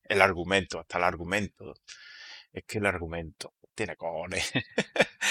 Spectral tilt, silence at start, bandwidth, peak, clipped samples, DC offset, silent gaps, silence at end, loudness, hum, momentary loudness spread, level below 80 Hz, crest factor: -3.5 dB/octave; 0.1 s; 16.5 kHz; -2 dBFS; under 0.1%; under 0.1%; none; 0 s; -29 LUFS; none; 21 LU; -54 dBFS; 28 dB